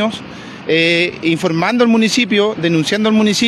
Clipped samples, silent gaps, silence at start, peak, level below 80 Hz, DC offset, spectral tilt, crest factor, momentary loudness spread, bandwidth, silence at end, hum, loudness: under 0.1%; none; 0 s; -2 dBFS; -56 dBFS; under 0.1%; -4.5 dB/octave; 12 dB; 8 LU; 13 kHz; 0 s; none; -14 LUFS